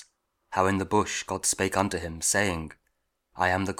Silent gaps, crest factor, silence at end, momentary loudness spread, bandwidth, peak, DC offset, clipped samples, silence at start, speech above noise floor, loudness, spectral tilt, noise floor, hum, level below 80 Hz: none; 22 dB; 0.05 s; 7 LU; 18 kHz; -6 dBFS; under 0.1%; under 0.1%; 0 s; 49 dB; -27 LUFS; -3.5 dB/octave; -76 dBFS; none; -52 dBFS